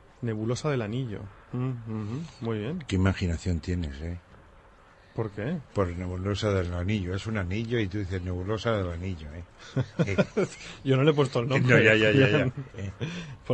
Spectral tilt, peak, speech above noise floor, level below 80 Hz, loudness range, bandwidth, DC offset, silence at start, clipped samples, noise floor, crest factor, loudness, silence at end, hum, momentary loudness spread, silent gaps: -6.5 dB/octave; -6 dBFS; 28 dB; -48 dBFS; 8 LU; 8.8 kHz; under 0.1%; 0.2 s; under 0.1%; -55 dBFS; 22 dB; -28 LUFS; 0 s; none; 15 LU; none